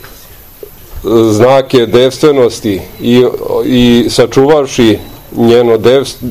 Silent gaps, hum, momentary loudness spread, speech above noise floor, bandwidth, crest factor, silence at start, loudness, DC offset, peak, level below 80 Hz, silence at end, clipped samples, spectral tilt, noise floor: none; none; 9 LU; 26 dB; 16.5 kHz; 8 dB; 0.05 s; -8 LUFS; 0.9%; 0 dBFS; -34 dBFS; 0 s; 3%; -5.5 dB/octave; -34 dBFS